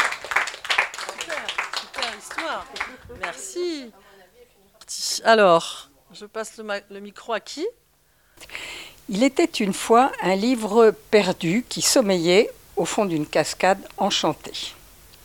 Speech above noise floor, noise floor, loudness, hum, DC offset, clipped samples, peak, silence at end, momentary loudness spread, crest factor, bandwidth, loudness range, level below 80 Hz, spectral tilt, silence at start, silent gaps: 40 dB; -61 dBFS; -22 LUFS; none; under 0.1%; under 0.1%; -2 dBFS; 0.5 s; 16 LU; 20 dB; 19 kHz; 11 LU; -58 dBFS; -3.5 dB/octave; 0 s; none